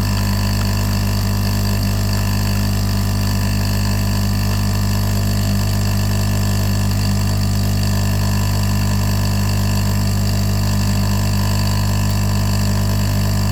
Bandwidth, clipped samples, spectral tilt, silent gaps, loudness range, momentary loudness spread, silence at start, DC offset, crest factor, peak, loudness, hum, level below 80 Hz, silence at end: over 20 kHz; under 0.1%; -5.5 dB/octave; none; 1 LU; 1 LU; 0 s; under 0.1%; 10 dB; -6 dBFS; -18 LUFS; 50 Hz at -15 dBFS; -24 dBFS; 0 s